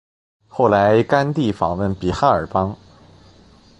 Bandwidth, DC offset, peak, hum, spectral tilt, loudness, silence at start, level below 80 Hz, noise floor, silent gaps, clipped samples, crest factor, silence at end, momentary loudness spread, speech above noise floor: 11 kHz; under 0.1%; 0 dBFS; none; -7.5 dB/octave; -18 LUFS; 0.55 s; -42 dBFS; -49 dBFS; none; under 0.1%; 18 dB; 1.05 s; 10 LU; 32 dB